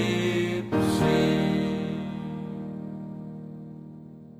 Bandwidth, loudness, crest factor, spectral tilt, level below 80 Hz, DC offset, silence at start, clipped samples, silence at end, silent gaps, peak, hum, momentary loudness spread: 16 kHz; -27 LUFS; 14 dB; -6.5 dB/octave; -52 dBFS; under 0.1%; 0 s; under 0.1%; 0 s; none; -12 dBFS; 50 Hz at -60 dBFS; 19 LU